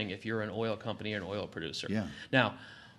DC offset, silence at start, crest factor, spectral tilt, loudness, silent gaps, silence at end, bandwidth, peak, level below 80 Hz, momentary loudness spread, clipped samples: under 0.1%; 0 s; 26 dB; -5.5 dB/octave; -34 LUFS; none; 0.05 s; 12 kHz; -10 dBFS; -68 dBFS; 9 LU; under 0.1%